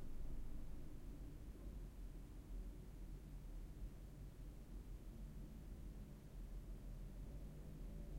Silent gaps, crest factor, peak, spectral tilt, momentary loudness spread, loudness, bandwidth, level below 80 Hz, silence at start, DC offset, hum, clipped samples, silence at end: none; 12 dB; -38 dBFS; -7 dB/octave; 2 LU; -57 LUFS; 16 kHz; -52 dBFS; 0 s; under 0.1%; none; under 0.1%; 0 s